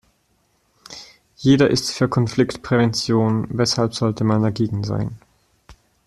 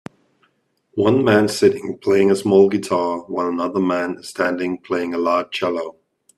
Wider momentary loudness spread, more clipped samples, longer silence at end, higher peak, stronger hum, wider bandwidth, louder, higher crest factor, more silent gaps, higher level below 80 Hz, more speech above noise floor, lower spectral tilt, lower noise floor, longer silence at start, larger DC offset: first, 13 LU vs 10 LU; neither; about the same, 0.35 s vs 0.45 s; about the same, -4 dBFS vs -2 dBFS; neither; about the same, 12.5 kHz vs 13 kHz; about the same, -19 LUFS vs -19 LUFS; about the same, 18 dB vs 18 dB; neither; first, -50 dBFS vs -62 dBFS; about the same, 46 dB vs 46 dB; about the same, -6 dB/octave vs -5.5 dB/octave; about the same, -64 dBFS vs -64 dBFS; about the same, 0.9 s vs 0.95 s; neither